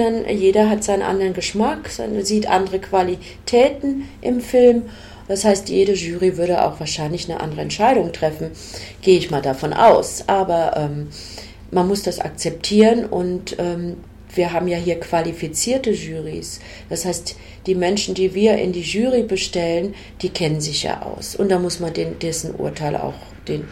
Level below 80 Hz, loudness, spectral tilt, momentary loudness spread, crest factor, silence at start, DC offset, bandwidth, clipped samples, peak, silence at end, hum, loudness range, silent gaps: -44 dBFS; -19 LUFS; -4.5 dB/octave; 13 LU; 18 dB; 0 s; under 0.1%; 16.5 kHz; under 0.1%; -2 dBFS; 0 s; none; 4 LU; none